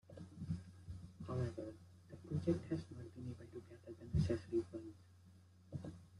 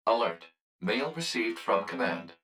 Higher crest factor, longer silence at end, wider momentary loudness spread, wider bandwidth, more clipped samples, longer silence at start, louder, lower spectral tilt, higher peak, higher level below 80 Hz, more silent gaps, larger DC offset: about the same, 20 dB vs 18 dB; about the same, 0 s vs 0.1 s; first, 18 LU vs 5 LU; second, 11.5 kHz vs 16.5 kHz; neither; about the same, 0.05 s vs 0.05 s; second, -45 LUFS vs -31 LUFS; first, -8.5 dB/octave vs -4 dB/octave; second, -24 dBFS vs -12 dBFS; first, -62 dBFS vs -78 dBFS; second, none vs 0.61-0.79 s; neither